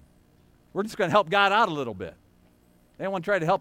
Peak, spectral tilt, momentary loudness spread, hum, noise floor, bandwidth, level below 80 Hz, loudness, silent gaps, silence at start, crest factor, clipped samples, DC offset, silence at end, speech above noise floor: -6 dBFS; -5 dB/octave; 15 LU; 60 Hz at -60 dBFS; -60 dBFS; 16 kHz; -62 dBFS; -25 LUFS; none; 0.75 s; 22 dB; under 0.1%; under 0.1%; 0 s; 36 dB